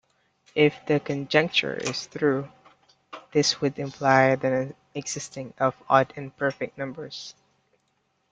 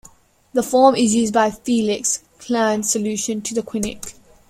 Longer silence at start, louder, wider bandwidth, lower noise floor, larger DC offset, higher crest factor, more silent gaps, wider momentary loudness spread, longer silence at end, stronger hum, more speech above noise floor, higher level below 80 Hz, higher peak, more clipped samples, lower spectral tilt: about the same, 0.55 s vs 0.55 s; second, -25 LUFS vs -19 LUFS; second, 9.4 kHz vs 16 kHz; first, -72 dBFS vs -50 dBFS; neither; about the same, 22 dB vs 18 dB; neither; first, 15 LU vs 11 LU; first, 1 s vs 0.4 s; neither; first, 47 dB vs 31 dB; second, -66 dBFS vs -52 dBFS; about the same, -4 dBFS vs -2 dBFS; neither; about the same, -4.5 dB/octave vs -3.5 dB/octave